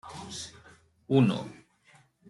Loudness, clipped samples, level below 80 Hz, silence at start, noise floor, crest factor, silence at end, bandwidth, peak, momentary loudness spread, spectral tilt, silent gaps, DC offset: -29 LUFS; under 0.1%; -66 dBFS; 0.05 s; -62 dBFS; 22 dB; 0.75 s; 11.5 kHz; -10 dBFS; 19 LU; -6.5 dB/octave; none; under 0.1%